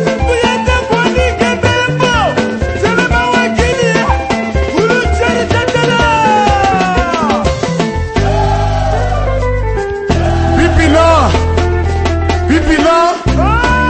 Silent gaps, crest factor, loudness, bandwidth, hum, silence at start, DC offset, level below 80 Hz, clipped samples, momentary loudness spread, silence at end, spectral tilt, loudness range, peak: none; 10 dB; -11 LUFS; 8.8 kHz; none; 0 s; under 0.1%; -20 dBFS; under 0.1%; 5 LU; 0 s; -5.5 dB/octave; 3 LU; 0 dBFS